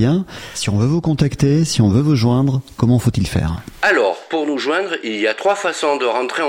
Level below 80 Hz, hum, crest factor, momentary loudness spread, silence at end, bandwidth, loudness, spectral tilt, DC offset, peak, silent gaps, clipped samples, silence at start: -38 dBFS; none; 14 dB; 6 LU; 0 s; 16 kHz; -17 LUFS; -6 dB/octave; under 0.1%; -2 dBFS; none; under 0.1%; 0 s